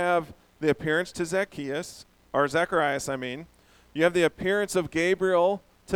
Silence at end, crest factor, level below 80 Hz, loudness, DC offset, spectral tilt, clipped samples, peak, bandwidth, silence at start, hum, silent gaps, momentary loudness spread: 0 s; 18 dB; -58 dBFS; -26 LUFS; under 0.1%; -4.5 dB/octave; under 0.1%; -8 dBFS; 17 kHz; 0 s; none; none; 12 LU